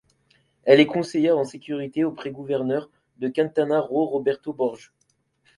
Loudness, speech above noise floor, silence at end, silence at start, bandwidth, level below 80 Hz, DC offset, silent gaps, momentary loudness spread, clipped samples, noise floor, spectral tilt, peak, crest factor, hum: -23 LUFS; 47 dB; 0.8 s; 0.65 s; 11.5 kHz; -68 dBFS; under 0.1%; none; 13 LU; under 0.1%; -69 dBFS; -6.5 dB/octave; -2 dBFS; 22 dB; none